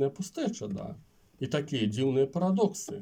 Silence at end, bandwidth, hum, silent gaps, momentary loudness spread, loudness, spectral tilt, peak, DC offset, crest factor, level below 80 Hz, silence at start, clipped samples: 0 s; 16 kHz; none; none; 12 LU; -30 LUFS; -6 dB/octave; -14 dBFS; under 0.1%; 16 dB; -66 dBFS; 0 s; under 0.1%